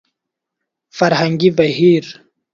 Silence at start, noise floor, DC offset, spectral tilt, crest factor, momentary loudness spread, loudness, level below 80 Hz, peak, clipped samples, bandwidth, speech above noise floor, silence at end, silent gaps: 0.95 s; -80 dBFS; under 0.1%; -6.5 dB/octave; 16 dB; 15 LU; -14 LUFS; -58 dBFS; 0 dBFS; under 0.1%; 7.4 kHz; 67 dB; 0.4 s; none